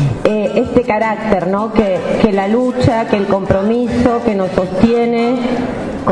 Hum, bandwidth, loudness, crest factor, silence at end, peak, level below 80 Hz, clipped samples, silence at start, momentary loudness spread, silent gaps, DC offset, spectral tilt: none; 10.5 kHz; -14 LUFS; 14 dB; 0 s; 0 dBFS; -36 dBFS; under 0.1%; 0 s; 3 LU; none; under 0.1%; -7.5 dB/octave